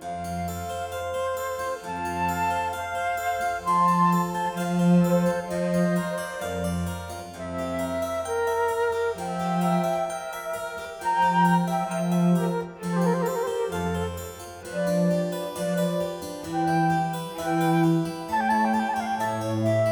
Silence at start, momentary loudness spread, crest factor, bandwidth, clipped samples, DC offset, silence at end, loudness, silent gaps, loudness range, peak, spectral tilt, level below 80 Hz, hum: 0 s; 10 LU; 16 dB; 19.5 kHz; under 0.1%; under 0.1%; 0 s; -26 LUFS; none; 4 LU; -10 dBFS; -6.5 dB/octave; -54 dBFS; none